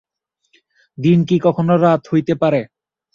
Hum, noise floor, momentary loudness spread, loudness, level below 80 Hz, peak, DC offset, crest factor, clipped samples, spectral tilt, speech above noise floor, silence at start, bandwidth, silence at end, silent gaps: none; -69 dBFS; 7 LU; -16 LUFS; -56 dBFS; -2 dBFS; under 0.1%; 14 dB; under 0.1%; -9 dB/octave; 54 dB; 1 s; 7 kHz; 0.5 s; none